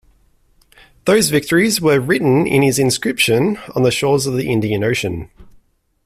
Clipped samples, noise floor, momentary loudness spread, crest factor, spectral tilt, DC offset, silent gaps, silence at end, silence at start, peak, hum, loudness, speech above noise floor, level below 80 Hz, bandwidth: under 0.1%; -55 dBFS; 5 LU; 14 dB; -4.5 dB/octave; under 0.1%; none; 0.6 s; 1.05 s; -2 dBFS; none; -15 LUFS; 39 dB; -46 dBFS; 15.5 kHz